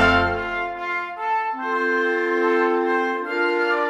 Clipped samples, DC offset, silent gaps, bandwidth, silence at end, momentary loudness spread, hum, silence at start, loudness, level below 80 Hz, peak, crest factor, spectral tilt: under 0.1%; under 0.1%; none; 10 kHz; 0 s; 6 LU; none; 0 s; -22 LUFS; -44 dBFS; -4 dBFS; 18 dB; -5.5 dB/octave